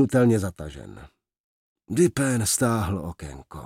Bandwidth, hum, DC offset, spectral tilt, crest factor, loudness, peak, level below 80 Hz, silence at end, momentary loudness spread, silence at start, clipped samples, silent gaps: 16.5 kHz; none; under 0.1%; -5.5 dB/octave; 18 dB; -23 LUFS; -8 dBFS; -50 dBFS; 0 s; 19 LU; 0 s; under 0.1%; 1.40-1.76 s